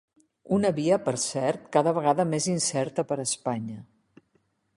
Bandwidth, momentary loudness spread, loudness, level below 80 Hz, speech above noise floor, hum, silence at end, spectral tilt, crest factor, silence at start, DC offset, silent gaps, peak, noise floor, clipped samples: 11.5 kHz; 7 LU; -26 LUFS; -66 dBFS; 45 dB; none; 0.95 s; -4.5 dB/octave; 20 dB; 0.45 s; under 0.1%; none; -8 dBFS; -70 dBFS; under 0.1%